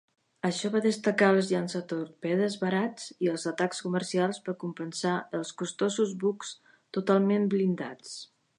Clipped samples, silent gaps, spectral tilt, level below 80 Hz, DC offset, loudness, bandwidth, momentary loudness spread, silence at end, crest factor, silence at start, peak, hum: under 0.1%; none; -5.5 dB/octave; -78 dBFS; under 0.1%; -29 LUFS; 11 kHz; 11 LU; 0.35 s; 18 dB; 0.45 s; -10 dBFS; none